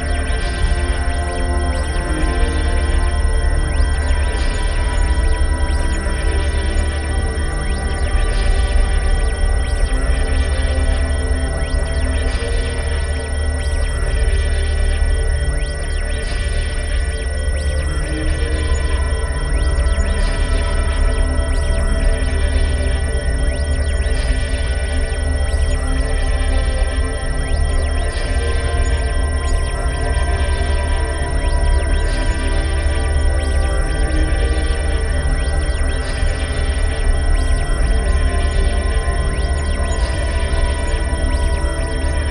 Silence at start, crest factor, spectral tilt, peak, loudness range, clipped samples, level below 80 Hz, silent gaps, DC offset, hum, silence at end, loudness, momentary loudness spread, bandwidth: 0 s; 14 dB; -5 dB/octave; -2 dBFS; 1 LU; under 0.1%; -18 dBFS; none; 0.5%; none; 0 s; -20 LUFS; 3 LU; 11 kHz